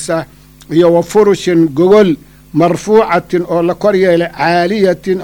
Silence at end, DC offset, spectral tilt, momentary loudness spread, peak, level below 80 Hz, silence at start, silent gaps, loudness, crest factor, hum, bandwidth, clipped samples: 0 s; under 0.1%; -6 dB/octave; 8 LU; 0 dBFS; -44 dBFS; 0 s; none; -11 LUFS; 10 dB; 50 Hz at -40 dBFS; 19 kHz; under 0.1%